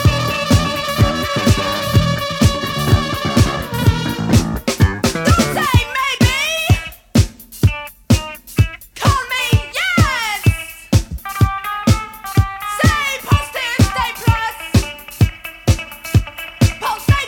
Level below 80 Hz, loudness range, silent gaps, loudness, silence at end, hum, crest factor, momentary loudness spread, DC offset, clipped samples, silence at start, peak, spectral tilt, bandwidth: -26 dBFS; 2 LU; none; -16 LUFS; 0 s; none; 16 dB; 5 LU; under 0.1%; under 0.1%; 0 s; 0 dBFS; -5 dB/octave; 19 kHz